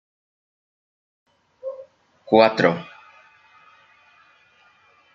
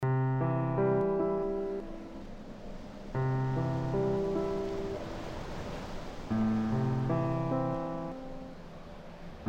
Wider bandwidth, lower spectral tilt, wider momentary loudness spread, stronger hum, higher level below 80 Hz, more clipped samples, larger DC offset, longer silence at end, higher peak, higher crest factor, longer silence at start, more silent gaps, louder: about the same, 7.6 kHz vs 8 kHz; second, -6.5 dB/octave vs -8.5 dB/octave; first, 24 LU vs 16 LU; neither; second, -72 dBFS vs -48 dBFS; neither; neither; first, 2.3 s vs 0 s; first, -2 dBFS vs -18 dBFS; first, 24 dB vs 14 dB; first, 1.65 s vs 0 s; neither; first, -18 LUFS vs -33 LUFS